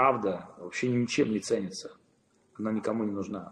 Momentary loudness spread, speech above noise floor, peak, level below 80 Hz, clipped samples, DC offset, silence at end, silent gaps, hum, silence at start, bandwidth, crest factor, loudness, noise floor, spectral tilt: 11 LU; 38 dB; -10 dBFS; -70 dBFS; under 0.1%; under 0.1%; 0 s; none; none; 0 s; 11 kHz; 20 dB; -31 LUFS; -68 dBFS; -5.5 dB/octave